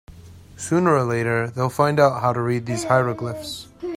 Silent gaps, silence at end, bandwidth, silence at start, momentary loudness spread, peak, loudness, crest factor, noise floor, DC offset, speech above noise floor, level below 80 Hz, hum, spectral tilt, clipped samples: none; 0 s; 16 kHz; 0.1 s; 13 LU; -2 dBFS; -21 LUFS; 18 dB; -43 dBFS; under 0.1%; 22 dB; -54 dBFS; none; -6 dB/octave; under 0.1%